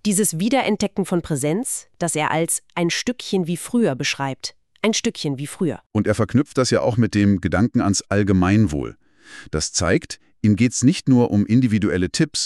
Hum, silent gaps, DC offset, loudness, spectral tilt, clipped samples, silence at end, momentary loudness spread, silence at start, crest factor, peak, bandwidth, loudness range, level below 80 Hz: none; 5.86-5.90 s; under 0.1%; -20 LUFS; -5 dB/octave; under 0.1%; 0 s; 8 LU; 0.05 s; 16 dB; -4 dBFS; 13.5 kHz; 3 LU; -46 dBFS